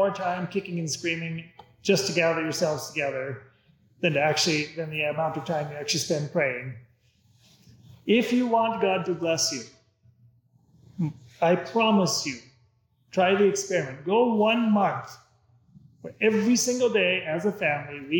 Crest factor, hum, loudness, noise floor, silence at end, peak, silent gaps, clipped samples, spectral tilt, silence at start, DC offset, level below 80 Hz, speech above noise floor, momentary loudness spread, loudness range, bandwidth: 18 dB; none; -25 LUFS; -65 dBFS; 0 s; -8 dBFS; none; under 0.1%; -4 dB/octave; 0 s; under 0.1%; -70 dBFS; 40 dB; 12 LU; 3 LU; 19 kHz